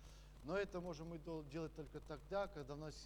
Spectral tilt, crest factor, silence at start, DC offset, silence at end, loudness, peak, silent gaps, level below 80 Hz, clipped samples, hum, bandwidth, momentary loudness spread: -6 dB/octave; 18 dB; 0 s; under 0.1%; 0 s; -48 LUFS; -32 dBFS; none; -60 dBFS; under 0.1%; none; over 20 kHz; 10 LU